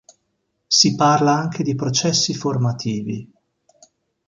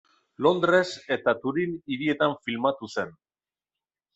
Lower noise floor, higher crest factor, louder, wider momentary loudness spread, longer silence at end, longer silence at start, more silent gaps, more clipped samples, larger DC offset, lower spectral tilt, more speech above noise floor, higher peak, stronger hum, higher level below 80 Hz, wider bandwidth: second, -72 dBFS vs under -90 dBFS; about the same, 20 dB vs 20 dB; first, -18 LUFS vs -26 LUFS; about the same, 11 LU vs 10 LU; about the same, 1 s vs 1.05 s; first, 0.7 s vs 0.4 s; neither; neither; neither; second, -4 dB/octave vs -5.5 dB/octave; second, 53 dB vs over 65 dB; first, -2 dBFS vs -8 dBFS; neither; first, -58 dBFS vs -68 dBFS; first, 10.5 kHz vs 8.2 kHz